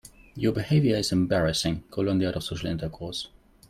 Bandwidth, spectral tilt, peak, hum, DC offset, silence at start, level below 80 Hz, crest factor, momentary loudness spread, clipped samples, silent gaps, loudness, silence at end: 15.5 kHz; -5.5 dB/octave; -12 dBFS; none; under 0.1%; 0.35 s; -48 dBFS; 16 dB; 11 LU; under 0.1%; none; -26 LUFS; 0.4 s